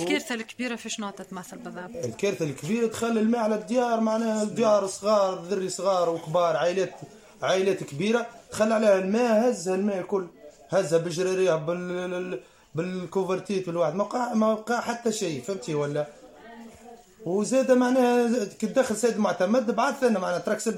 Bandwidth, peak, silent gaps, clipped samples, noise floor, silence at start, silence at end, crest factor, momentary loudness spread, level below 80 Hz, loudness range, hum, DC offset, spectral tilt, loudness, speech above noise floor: 16 kHz; -10 dBFS; none; under 0.1%; -49 dBFS; 0 s; 0 s; 16 dB; 12 LU; -68 dBFS; 4 LU; none; under 0.1%; -5 dB/octave; -26 LUFS; 24 dB